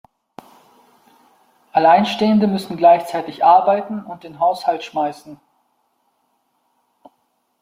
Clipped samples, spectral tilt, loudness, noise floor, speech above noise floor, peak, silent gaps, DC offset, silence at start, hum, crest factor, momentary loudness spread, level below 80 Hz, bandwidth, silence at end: under 0.1%; -6.5 dB/octave; -16 LUFS; -67 dBFS; 51 dB; -2 dBFS; none; under 0.1%; 1.75 s; none; 18 dB; 14 LU; -66 dBFS; 16 kHz; 2.3 s